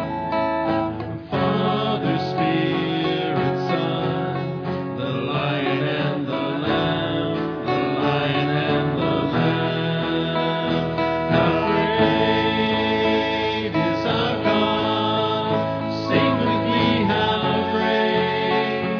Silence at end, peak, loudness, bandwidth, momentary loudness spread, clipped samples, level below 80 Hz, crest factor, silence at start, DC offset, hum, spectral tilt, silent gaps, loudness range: 0 s; -4 dBFS; -21 LUFS; 5.4 kHz; 5 LU; under 0.1%; -48 dBFS; 16 dB; 0 s; under 0.1%; none; -7.5 dB/octave; none; 3 LU